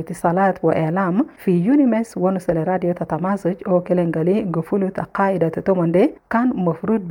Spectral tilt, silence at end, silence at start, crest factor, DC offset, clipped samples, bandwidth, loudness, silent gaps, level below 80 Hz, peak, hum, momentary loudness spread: -9 dB/octave; 0 s; 0 s; 14 dB; under 0.1%; under 0.1%; 17 kHz; -19 LUFS; none; -54 dBFS; -4 dBFS; none; 5 LU